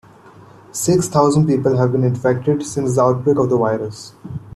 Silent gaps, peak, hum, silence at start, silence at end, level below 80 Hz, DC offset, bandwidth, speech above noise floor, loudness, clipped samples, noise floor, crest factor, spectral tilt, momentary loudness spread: none; -2 dBFS; none; 0.75 s; 0.05 s; -50 dBFS; under 0.1%; 13.5 kHz; 27 dB; -17 LUFS; under 0.1%; -43 dBFS; 16 dB; -6.5 dB/octave; 15 LU